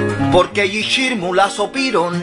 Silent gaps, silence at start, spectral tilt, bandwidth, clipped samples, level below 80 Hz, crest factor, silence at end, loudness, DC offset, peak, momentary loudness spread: none; 0 s; -4.5 dB/octave; 11 kHz; under 0.1%; -44 dBFS; 16 dB; 0 s; -16 LUFS; under 0.1%; 0 dBFS; 3 LU